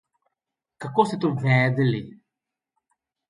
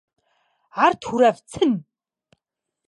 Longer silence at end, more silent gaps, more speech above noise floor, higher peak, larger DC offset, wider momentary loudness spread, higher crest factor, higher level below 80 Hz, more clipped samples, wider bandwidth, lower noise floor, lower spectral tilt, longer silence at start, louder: first, 1.2 s vs 1.05 s; neither; about the same, 64 dB vs 63 dB; about the same, -4 dBFS vs -4 dBFS; neither; about the same, 10 LU vs 8 LU; about the same, 20 dB vs 20 dB; about the same, -64 dBFS vs -60 dBFS; neither; about the same, 11 kHz vs 11.5 kHz; first, -86 dBFS vs -82 dBFS; first, -7.5 dB/octave vs -5 dB/octave; about the same, 0.8 s vs 0.75 s; second, -23 LUFS vs -20 LUFS